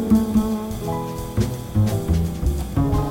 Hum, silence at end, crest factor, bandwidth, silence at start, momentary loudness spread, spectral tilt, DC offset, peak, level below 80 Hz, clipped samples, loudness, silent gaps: none; 0 s; 14 dB; 17 kHz; 0 s; 8 LU; -7.5 dB/octave; under 0.1%; -6 dBFS; -28 dBFS; under 0.1%; -22 LUFS; none